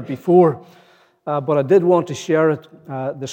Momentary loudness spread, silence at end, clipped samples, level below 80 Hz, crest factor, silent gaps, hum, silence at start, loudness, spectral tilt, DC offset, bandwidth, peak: 15 LU; 0 s; under 0.1%; -76 dBFS; 16 dB; none; none; 0 s; -17 LUFS; -7 dB/octave; under 0.1%; 8.8 kHz; -2 dBFS